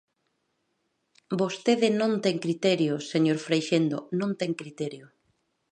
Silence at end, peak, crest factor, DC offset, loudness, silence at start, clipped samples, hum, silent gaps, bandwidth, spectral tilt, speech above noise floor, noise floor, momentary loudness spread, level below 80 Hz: 0.65 s; -10 dBFS; 18 dB; under 0.1%; -27 LUFS; 1.3 s; under 0.1%; none; none; 10 kHz; -5.5 dB/octave; 50 dB; -76 dBFS; 10 LU; -76 dBFS